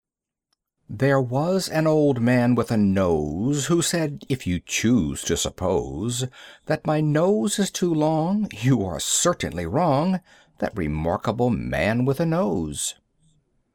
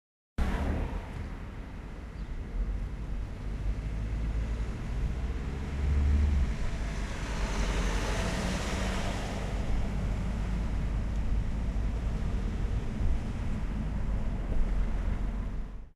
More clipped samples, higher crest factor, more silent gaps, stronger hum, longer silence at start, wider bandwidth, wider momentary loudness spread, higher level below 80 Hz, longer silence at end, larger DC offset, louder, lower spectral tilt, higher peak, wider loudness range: neither; about the same, 14 dB vs 14 dB; neither; neither; first, 0.9 s vs 0.4 s; first, 18 kHz vs 11.5 kHz; about the same, 7 LU vs 8 LU; second, -46 dBFS vs -32 dBFS; first, 0.85 s vs 0.1 s; neither; first, -23 LUFS vs -34 LUFS; about the same, -5 dB/octave vs -6 dB/octave; first, -8 dBFS vs -16 dBFS; second, 3 LU vs 6 LU